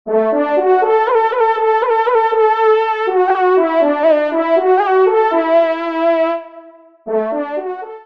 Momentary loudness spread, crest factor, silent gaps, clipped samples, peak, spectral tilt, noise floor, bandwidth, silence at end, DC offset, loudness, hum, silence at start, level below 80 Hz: 7 LU; 12 dB; none; under 0.1%; -2 dBFS; -6 dB/octave; -40 dBFS; 6 kHz; 0.05 s; 0.3%; -14 LUFS; none; 0.05 s; -68 dBFS